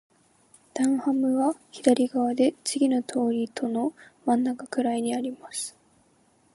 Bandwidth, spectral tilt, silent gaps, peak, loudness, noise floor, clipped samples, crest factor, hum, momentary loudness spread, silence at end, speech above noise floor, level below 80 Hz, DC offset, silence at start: 11.5 kHz; -4 dB/octave; none; -6 dBFS; -26 LUFS; -63 dBFS; under 0.1%; 20 dB; none; 10 LU; 0.85 s; 38 dB; -76 dBFS; under 0.1%; 0.75 s